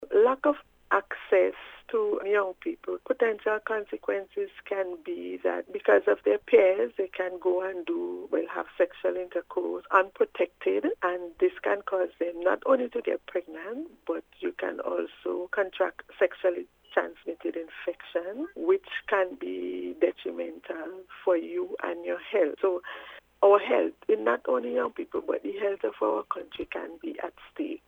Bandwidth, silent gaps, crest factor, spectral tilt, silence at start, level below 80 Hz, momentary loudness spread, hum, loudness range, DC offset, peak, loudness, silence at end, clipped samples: 3.9 kHz; none; 22 dB; -5.5 dB/octave; 0 s; -68 dBFS; 12 LU; none; 5 LU; under 0.1%; -6 dBFS; -29 LUFS; 0.1 s; under 0.1%